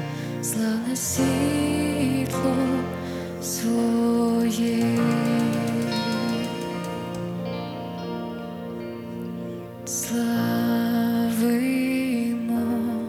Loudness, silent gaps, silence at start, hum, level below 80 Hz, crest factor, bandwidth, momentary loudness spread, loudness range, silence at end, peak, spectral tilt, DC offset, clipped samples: -25 LUFS; none; 0 s; none; -54 dBFS; 14 dB; 17 kHz; 11 LU; 7 LU; 0 s; -10 dBFS; -5 dB/octave; under 0.1%; under 0.1%